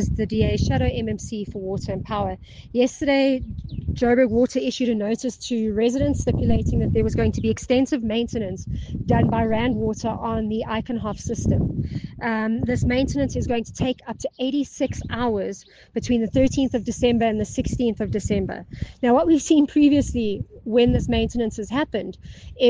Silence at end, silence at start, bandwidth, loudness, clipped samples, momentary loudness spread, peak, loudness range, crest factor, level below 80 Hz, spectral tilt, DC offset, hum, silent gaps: 0 s; 0 s; 9.8 kHz; -23 LUFS; under 0.1%; 11 LU; -6 dBFS; 4 LU; 16 dB; -36 dBFS; -6.5 dB/octave; under 0.1%; none; none